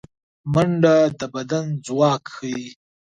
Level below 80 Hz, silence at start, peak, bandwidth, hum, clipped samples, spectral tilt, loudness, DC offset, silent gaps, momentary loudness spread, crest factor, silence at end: -54 dBFS; 0.45 s; -4 dBFS; 9.4 kHz; none; under 0.1%; -6.5 dB/octave; -20 LUFS; under 0.1%; none; 14 LU; 18 dB; 0.35 s